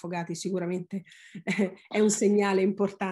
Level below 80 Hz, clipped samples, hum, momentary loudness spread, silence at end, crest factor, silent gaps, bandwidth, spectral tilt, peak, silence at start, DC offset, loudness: -74 dBFS; under 0.1%; none; 15 LU; 0 s; 14 dB; none; 12.5 kHz; -5 dB/octave; -12 dBFS; 0.05 s; under 0.1%; -27 LUFS